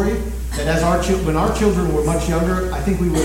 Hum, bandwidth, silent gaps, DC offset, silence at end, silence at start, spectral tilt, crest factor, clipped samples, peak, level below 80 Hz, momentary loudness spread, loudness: none; 16.5 kHz; none; under 0.1%; 0 s; 0 s; -6 dB/octave; 14 dB; under 0.1%; -4 dBFS; -24 dBFS; 5 LU; -19 LUFS